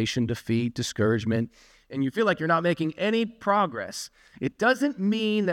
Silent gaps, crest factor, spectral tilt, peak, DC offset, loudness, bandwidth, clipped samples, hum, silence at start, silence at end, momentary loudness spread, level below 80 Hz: none; 16 dB; -5.5 dB/octave; -8 dBFS; under 0.1%; -26 LUFS; 16 kHz; under 0.1%; none; 0 s; 0 s; 10 LU; -60 dBFS